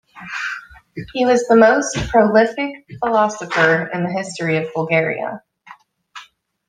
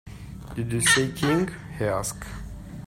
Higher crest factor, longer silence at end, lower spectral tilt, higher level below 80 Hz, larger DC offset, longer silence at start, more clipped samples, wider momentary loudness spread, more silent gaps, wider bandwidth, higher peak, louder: about the same, 16 dB vs 20 dB; first, 0.45 s vs 0 s; first, -5 dB/octave vs -3.5 dB/octave; about the same, -46 dBFS vs -44 dBFS; neither; about the same, 0.15 s vs 0.05 s; neither; second, 16 LU vs 20 LU; neither; second, 10 kHz vs 16 kHz; first, -2 dBFS vs -6 dBFS; first, -17 LUFS vs -24 LUFS